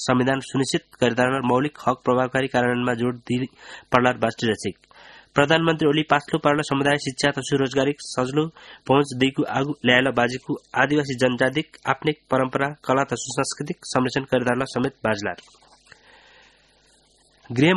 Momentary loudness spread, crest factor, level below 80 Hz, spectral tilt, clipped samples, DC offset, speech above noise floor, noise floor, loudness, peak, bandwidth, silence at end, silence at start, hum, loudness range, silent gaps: 8 LU; 22 dB; -56 dBFS; -5 dB/octave; under 0.1%; under 0.1%; 37 dB; -59 dBFS; -22 LUFS; 0 dBFS; 11.5 kHz; 0 s; 0 s; none; 4 LU; none